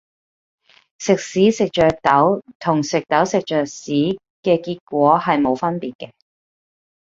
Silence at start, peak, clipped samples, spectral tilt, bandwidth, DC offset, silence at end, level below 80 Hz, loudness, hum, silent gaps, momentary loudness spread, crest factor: 1 s; -2 dBFS; under 0.1%; -5.5 dB/octave; 7.8 kHz; under 0.1%; 1.15 s; -54 dBFS; -18 LUFS; none; 2.55-2.60 s, 4.30-4.43 s, 4.81-4.87 s, 5.95-5.99 s; 9 LU; 18 dB